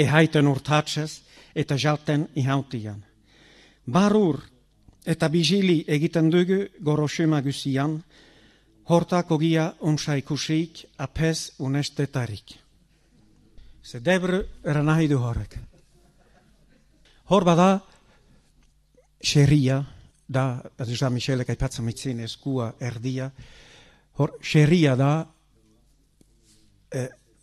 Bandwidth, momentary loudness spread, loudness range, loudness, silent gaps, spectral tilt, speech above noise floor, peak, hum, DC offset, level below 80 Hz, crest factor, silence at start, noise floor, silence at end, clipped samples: 13 kHz; 15 LU; 6 LU; -24 LUFS; none; -6 dB/octave; 38 dB; -4 dBFS; none; under 0.1%; -48 dBFS; 20 dB; 0 s; -61 dBFS; 0.35 s; under 0.1%